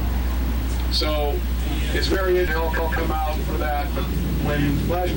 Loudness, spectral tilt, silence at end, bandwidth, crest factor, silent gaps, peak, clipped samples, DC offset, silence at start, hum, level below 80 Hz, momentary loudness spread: -23 LUFS; -6 dB/octave; 0 s; 17 kHz; 10 dB; none; -12 dBFS; under 0.1%; under 0.1%; 0 s; none; -24 dBFS; 4 LU